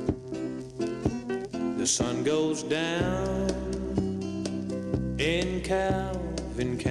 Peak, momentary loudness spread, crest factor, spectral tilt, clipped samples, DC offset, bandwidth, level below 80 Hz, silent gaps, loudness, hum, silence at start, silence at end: -14 dBFS; 7 LU; 16 dB; -4.5 dB/octave; under 0.1%; under 0.1%; 12.5 kHz; -42 dBFS; none; -29 LUFS; none; 0 s; 0 s